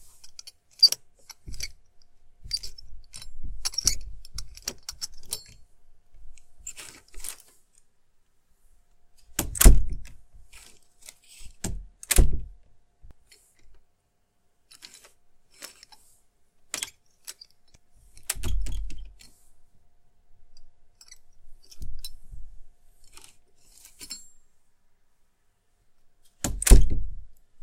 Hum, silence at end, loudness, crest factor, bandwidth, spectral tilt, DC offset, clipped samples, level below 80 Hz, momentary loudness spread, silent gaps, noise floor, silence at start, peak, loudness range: none; 0.3 s; -26 LUFS; 26 dB; 16.5 kHz; -3 dB/octave; under 0.1%; under 0.1%; -30 dBFS; 29 LU; none; -69 dBFS; 0.25 s; 0 dBFS; 22 LU